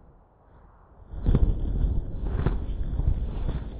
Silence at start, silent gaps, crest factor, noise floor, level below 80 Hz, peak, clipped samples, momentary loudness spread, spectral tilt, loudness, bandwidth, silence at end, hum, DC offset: 1 s; none; 18 dB; -55 dBFS; -28 dBFS; -8 dBFS; under 0.1%; 7 LU; -12 dB/octave; -29 LUFS; 4 kHz; 0 s; none; under 0.1%